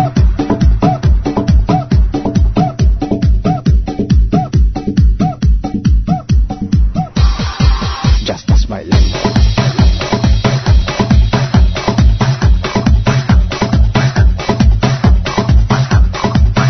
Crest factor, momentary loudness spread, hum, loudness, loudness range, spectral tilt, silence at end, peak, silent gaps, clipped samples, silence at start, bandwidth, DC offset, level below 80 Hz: 10 dB; 3 LU; none; -13 LUFS; 2 LU; -7 dB/octave; 0 s; 0 dBFS; none; under 0.1%; 0 s; 6.4 kHz; under 0.1%; -14 dBFS